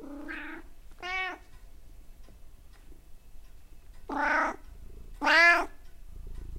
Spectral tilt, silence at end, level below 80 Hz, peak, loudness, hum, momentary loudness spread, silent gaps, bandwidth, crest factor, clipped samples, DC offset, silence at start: -3 dB/octave; 0 s; -48 dBFS; -10 dBFS; -26 LUFS; none; 27 LU; none; 16 kHz; 22 dB; under 0.1%; under 0.1%; 0 s